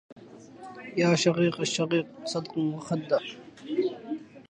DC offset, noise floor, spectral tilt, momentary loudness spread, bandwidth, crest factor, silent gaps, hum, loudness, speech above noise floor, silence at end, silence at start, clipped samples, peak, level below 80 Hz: under 0.1%; -47 dBFS; -5 dB/octave; 19 LU; 9.8 kHz; 20 dB; 0.12-0.16 s; none; -28 LUFS; 20 dB; 0.1 s; 0.1 s; under 0.1%; -8 dBFS; -70 dBFS